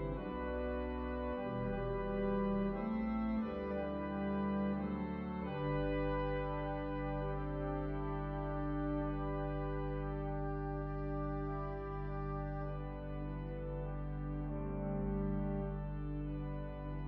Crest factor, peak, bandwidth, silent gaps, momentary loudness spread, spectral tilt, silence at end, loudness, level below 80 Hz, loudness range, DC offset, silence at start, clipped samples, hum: 14 dB; -24 dBFS; 4.7 kHz; none; 6 LU; -7.5 dB/octave; 0 s; -40 LUFS; -46 dBFS; 4 LU; under 0.1%; 0 s; under 0.1%; none